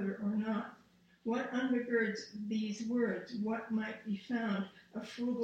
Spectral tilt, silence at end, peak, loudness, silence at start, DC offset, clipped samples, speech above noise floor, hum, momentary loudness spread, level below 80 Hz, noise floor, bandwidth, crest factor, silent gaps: -6 dB/octave; 0 s; -20 dBFS; -37 LUFS; 0 s; under 0.1%; under 0.1%; 30 dB; none; 9 LU; -76 dBFS; -66 dBFS; 8.6 kHz; 16 dB; none